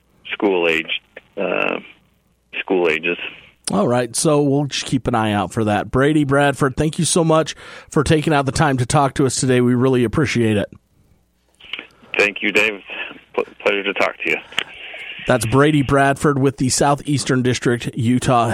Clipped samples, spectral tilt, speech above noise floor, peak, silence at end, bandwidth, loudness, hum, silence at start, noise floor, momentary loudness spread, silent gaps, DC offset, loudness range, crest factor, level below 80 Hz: under 0.1%; -5 dB/octave; 43 dB; 0 dBFS; 0 s; 16 kHz; -18 LUFS; none; 0.25 s; -60 dBFS; 13 LU; none; under 0.1%; 4 LU; 18 dB; -44 dBFS